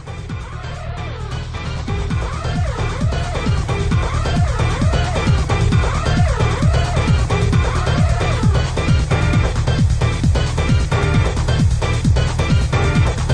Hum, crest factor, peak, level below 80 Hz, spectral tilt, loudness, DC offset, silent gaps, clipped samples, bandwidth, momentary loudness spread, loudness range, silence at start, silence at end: none; 12 dB; -4 dBFS; -22 dBFS; -6 dB/octave; -18 LUFS; under 0.1%; none; under 0.1%; 10.5 kHz; 9 LU; 5 LU; 0 s; 0 s